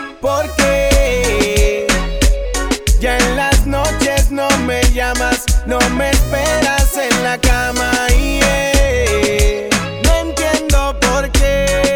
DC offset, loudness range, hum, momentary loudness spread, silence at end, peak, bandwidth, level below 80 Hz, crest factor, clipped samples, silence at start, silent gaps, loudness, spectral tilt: under 0.1%; 1 LU; none; 3 LU; 0 s; -2 dBFS; 20 kHz; -18 dBFS; 10 dB; under 0.1%; 0 s; none; -14 LUFS; -4 dB/octave